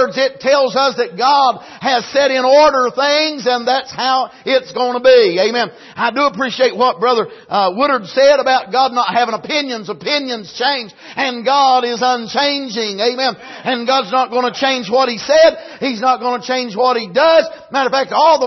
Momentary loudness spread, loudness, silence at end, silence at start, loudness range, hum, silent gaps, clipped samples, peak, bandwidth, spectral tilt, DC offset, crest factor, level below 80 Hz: 9 LU; -14 LUFS; 0 s; 0 s; 3 LU; none; none; under 0.1%; -2 dBFS; 6.2 kHz; -3 dB/octave; under 0.1%; 14 dB; -60 dBFS